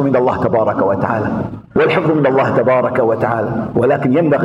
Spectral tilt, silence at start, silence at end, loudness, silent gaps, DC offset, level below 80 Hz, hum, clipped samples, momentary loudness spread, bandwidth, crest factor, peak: -9 dB/octave; 0 s; 0 s; -15 LUFS; none; under 0.1%; -46 dBFS; none; under 0.1%; 5 LU; 10.5 kHz; 14 dB; 0 dBFS